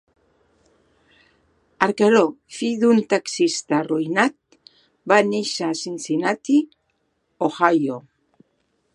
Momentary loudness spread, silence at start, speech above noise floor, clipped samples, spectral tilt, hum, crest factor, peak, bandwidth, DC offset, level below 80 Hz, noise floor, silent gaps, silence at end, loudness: 10 LU; 1.8 s; 50 dB; under 0.1%; -4.5 dB/octave; none; 22 dB; 0 dBFS; 11.5 kHz; under 0.1%; -70 dBFS; -70 dBFS; none; 0.95 s; -20 LUFS